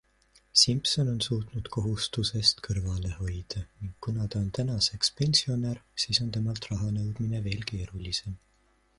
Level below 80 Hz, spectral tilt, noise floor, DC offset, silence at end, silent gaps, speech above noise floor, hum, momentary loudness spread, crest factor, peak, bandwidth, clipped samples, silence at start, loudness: -46 dBFS; -4 dB/octave; -67 dBFS; under 0.1%; 0.6 s; none; 37 dB; none; 12 LU; 22 dB; -8 dBFS; 11.5 kHz; under 0.1%; 0.55 s; -28 LUFS